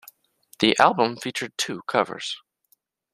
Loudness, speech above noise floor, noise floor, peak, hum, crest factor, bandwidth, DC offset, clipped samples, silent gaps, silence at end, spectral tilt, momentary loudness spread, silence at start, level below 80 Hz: -23 LUFS; 44 dB; -67 dBFS; -2 dBFS; none; 24 dB; 14.5 kHz; under 0.1%; under 0.1%; none; 0.75 s; -3 dB/octave; 14 LU; 0.6 s; -66 dBFS